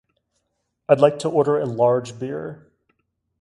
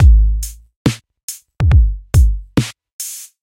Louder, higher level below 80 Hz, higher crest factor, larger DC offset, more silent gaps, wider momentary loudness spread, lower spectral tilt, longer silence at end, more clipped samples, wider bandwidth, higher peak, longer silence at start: second, -20 LUFS vs -17 LUFS; second, -64 dBFS vs -16 dBFS; first, 22 dB vs 14 dB; neither; second, none vs 0.76-0.85 s, 1.23-1.28 s, 2.93-2.99 s; about the same, 15 LU vs 16 LU; about the same, -6.5 dB/octave vs -6 dB/octave; first, 0.85 s vs 0.2 s; neither; second, 11.5 kHz vs 16.5 kHz; about the same, 0 dBFS vs 0 dBFS; first, 0.9 s vs 0 s